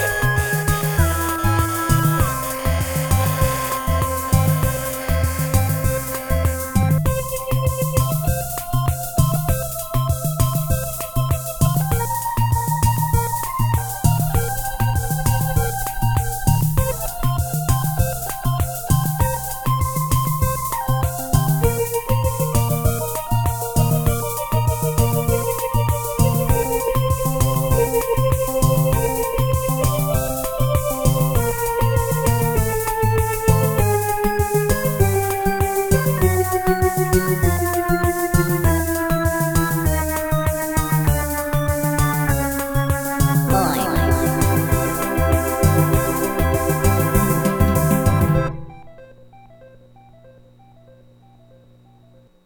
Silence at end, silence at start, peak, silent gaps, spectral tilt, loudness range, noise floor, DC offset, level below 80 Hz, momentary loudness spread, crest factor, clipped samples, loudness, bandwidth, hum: 2.8 s; 0 s; 0 dBFS; none; -5.5 dB/octave; 2 LU; -50 dBFS; under 0.1%; -28 dBFS; 4 LU; 18 dB; under 0.1%; -19 LUFS; 19.5 kHz; 60 Hz at -50 dBFS